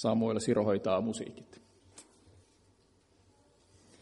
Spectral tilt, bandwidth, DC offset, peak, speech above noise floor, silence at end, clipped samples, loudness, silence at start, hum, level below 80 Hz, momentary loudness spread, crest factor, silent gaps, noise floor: -6 dB/octave; 11.5 kHz; under 0.1%; -16 dBFS; 36 dB; 2 s; under 0.1%; -31 LUFS; 0 s; none; -70 dBFS; 26 LU; 20 dB; none; -67 dBFS